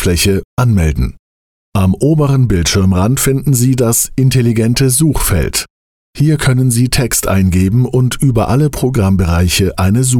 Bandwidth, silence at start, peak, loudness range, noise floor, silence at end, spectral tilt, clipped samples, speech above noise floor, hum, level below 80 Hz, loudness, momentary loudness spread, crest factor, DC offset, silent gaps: 17.5 kHz; 0 s; -2 dBFS; 2 LU; under -90 dBFS; 0 s; -5 dB/octave; under 0.1%; over 79 dB; none; -26 dBFS; -12 LUFS; 3 LU; 10 dB; under 0.1%; 0.45-0.57 s, 1.19-1.72 s, 5.70-6.13 s